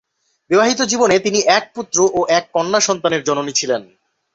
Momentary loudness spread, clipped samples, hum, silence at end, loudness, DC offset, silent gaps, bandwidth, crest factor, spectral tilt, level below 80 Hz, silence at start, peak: 5 LU; under 0.1%; none; 0.5 s; -16 LUFS; under 0.1%; none; 8.2 kHz; 16 dB; -2.5 dB/octave; -58 dBFS; 0.5 s; -2 dBFS